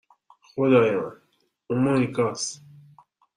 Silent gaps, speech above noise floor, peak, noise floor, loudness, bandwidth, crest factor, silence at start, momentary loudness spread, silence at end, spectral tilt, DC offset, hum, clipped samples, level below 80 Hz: none; 46 dB; -6 dBFS; -68 dBFS; -23 LUFS; 11 kHz; 18 dB; 0.55 s; 17 LU; 0.8 s; -5.5 dB/octave; under 0.1%; none; under 0.1%; -66 dBFS